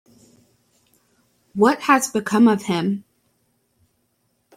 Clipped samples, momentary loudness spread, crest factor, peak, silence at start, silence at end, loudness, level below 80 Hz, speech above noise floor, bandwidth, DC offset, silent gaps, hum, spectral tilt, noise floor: under 0.1%; 11 LU; 20 dB; -2 dBFS; 1.55 s; 1.55 s; -19 LUFS; -66 dBFS; 51 dB; 15 kHz; under 0.1%; none; none; -5 dB/octave; -68 dBFS